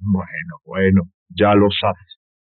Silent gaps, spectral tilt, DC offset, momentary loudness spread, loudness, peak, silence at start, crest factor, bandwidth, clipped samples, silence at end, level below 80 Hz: 1.14-1.26 s; -5 dB/octave; under 0.1%; 16 LU; -17 LUFS; -4 dBFS; 0 s; 14 dB; 4.3 kHz; under 0.1%; 0.5 s; -58 dBFS